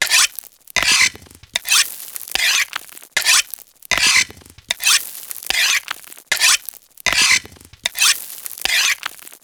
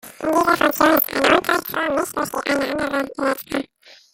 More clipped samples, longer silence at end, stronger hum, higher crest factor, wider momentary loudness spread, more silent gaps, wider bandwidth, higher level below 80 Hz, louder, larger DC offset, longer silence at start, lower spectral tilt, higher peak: neither; about the same, 0.15 s vs 0.2 s; neither; about the same, 20 dB vs 20 dB; first, 16 LU vs 9 LU; neither; first, over 20 kHz vs 17 kHz; about the same, -50 dBFS vs -54 dBFS; first, -16 LUFS vs -19 LUFS; neither; about the same, 0 s vs 0.05 s; second, 2.5 dB/octave vs -3 dB/octave; about the same, 0 dBFS vs 0 dBFS